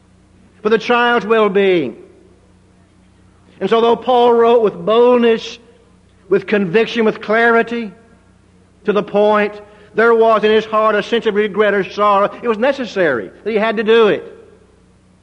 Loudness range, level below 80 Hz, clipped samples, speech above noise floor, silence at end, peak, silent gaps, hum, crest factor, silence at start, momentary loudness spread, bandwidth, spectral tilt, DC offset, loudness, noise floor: 3 LU; -56 dBFS; under 0.1%; 36 dB; 0.9 s; -2 dBFS; none; none; 14 dB; 0.65 s; 10 LU; 7.6 kHz; -6 dB/octave; under 0.1%; -14 LUFS; -49 dBFS